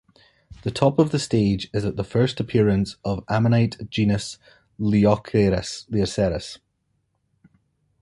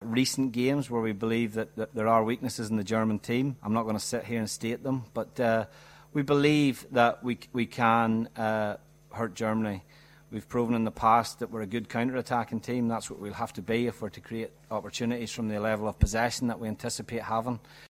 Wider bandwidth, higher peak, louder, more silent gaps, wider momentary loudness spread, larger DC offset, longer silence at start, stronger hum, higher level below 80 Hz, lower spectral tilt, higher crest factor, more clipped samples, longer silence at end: second, 11.5 kHz vs 16 kHz; first, -4 dBFS vs -8 dBFS; first, -22 LUFS vs -29 LUFS; neither; about the same, 11 LU vs 11 LU; neither; first, 0.5 s vs 0 s; neither; about the same, -44 dBFS vs -48 dBFS; about the same, -6.5 dB/octave vs -5.5 dB/octave; about the same, 20 dB vs 22 dB; neither; first, 1.45 s vs 0.05 s